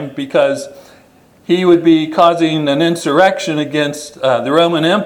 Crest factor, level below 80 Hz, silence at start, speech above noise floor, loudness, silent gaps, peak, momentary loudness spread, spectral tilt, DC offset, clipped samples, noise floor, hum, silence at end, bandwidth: 14 dB; -58 dBFS; 0 s; 34 dB; -13 LUFS; none; 0 dBFS; 8 LU; -5.5 dB/octave; under 0.1%; under 0.1%; -47 dBFS; none; 0 s; 13 kHz